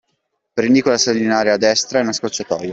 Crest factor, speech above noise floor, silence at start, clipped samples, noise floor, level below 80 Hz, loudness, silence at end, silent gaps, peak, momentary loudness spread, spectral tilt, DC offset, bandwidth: 14 dB; 55 dB; 0.55 s; under 0.1%; -71 dBFS; -58 dBFS; -16 LUFS; 0 s; none; -2 dBFS; 8 LU; -3 dB/octave; under 0.1%; 8 kHz